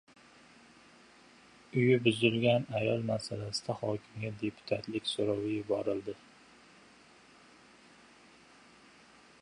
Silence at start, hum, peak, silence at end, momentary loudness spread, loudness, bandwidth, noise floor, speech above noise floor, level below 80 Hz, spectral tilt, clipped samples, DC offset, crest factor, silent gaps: 1.75 s; none; -12 dBFS; 3.25 s; 12 LU; -32 LUFS; 11 kHz; -59 dBFS; 28 dB; -68 dBFS; -6 dB/octave; under 0.1%; under 0.1%; 22 dB; none